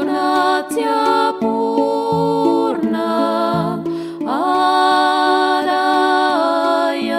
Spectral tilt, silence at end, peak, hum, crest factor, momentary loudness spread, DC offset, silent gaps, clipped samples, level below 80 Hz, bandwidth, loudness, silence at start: -5 dB/octave; 0 s; -2 dBFS; none; 14 dB; 5 LU; under 0.1%; none; under 0.1%; -58 dBFS; 15.5 kHz; -16 LUFS; 0 s